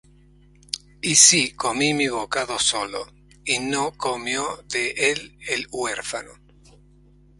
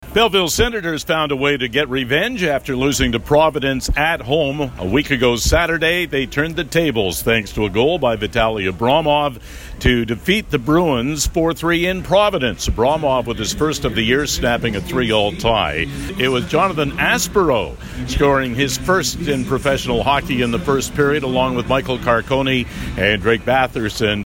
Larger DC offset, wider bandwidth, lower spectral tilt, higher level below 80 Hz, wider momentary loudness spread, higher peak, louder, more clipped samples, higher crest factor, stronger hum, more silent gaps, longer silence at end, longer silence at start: neither; about the same, 16 kHz vs 17 kHz; second, -1 dB/octave vs -4.5 dB/octave; second, -54 dBFS vs -32 dBFS; first, 19 LU vs 5 LU; about the same, 0 dBFS vs -2 dBFS; second, -20 LUFS vs -17 LUFS; neither; first, 24 dB vs 14 dB; first, 50 Hz at -50 dBFS vs none; neither; first, 1.05 s vs 0 s; first, 0.75 s vs 0 s